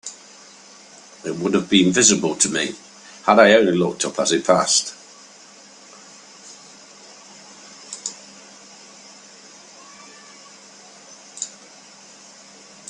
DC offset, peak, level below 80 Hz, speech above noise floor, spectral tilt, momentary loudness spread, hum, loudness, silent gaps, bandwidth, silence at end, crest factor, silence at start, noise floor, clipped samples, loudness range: under 0.1%; 0 dBFS; -64 dBFS; 29 dB; -3 dB/octave; 28 LU; none; -18 LUFS; none; 11 kHz; 1.4 s; 22 dB; 0.05 s; -46 dBFS; under 0.1%; 22 LU